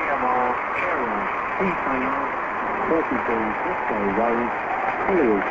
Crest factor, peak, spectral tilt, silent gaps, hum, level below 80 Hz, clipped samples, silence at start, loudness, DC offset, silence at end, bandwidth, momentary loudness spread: 14 dB; -8 dBFS; -7 dB/octave; none; none; -50 dBFS; under 0.1%; 0 s; -23 LUFS; under 0.1%; 0 s; 7.8 kHz; 4 LU